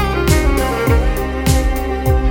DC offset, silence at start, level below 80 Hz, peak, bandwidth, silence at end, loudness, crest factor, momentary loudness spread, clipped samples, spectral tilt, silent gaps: under 0.1%; 0 s; -18 dBFS; 0 dBFS; 17 kHz; 0 s; -16 LUFS; 14 dB; 4 LU; under 0.1%; -5.5 dB/octave; none